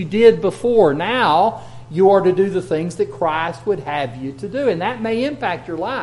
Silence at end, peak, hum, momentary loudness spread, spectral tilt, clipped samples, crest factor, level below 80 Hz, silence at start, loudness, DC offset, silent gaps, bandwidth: 0 s; 0 dBFS; none; 11 LU; -6.5 dB/octave; under 0.1%; 16 dB; -50 dBFS; 0 s; -18 LUFS; under 0.1%; none; 11.5 kHz